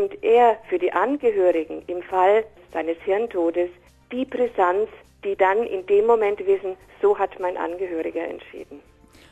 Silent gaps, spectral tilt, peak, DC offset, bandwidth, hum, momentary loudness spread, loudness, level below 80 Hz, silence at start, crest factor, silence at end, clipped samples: none; -6 dB/octave; -6 dBFS; under 0.1%; 8.8 kHz; none; 13 LU; -22 LUFS; -58 dBFS; 0 s; 16 dB; 0.5 s; under 0.1%